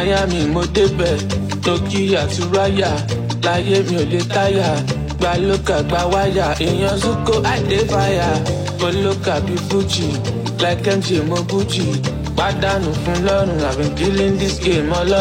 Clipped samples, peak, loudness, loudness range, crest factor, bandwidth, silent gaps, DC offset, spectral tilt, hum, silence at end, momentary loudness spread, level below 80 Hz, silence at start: under 0.1%; -4 dBFS; -17 LUFS; 1 LU; 14 dB; 16.5 kHz; none; under 0.1%; -5.5 dB/octave; none; 0 s; 4 LU; -30 dBFS; 0 s